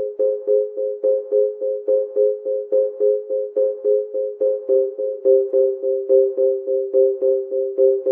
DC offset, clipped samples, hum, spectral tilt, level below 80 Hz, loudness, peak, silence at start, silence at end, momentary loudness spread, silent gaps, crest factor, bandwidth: under 0.1%; under 0.1%; none; -9 dB/octave; under -90 dBFS; -19 LUFS; -4 dBFS; 0 s; 0 s; 6 LU; none; 14 dB; 1.4 kHz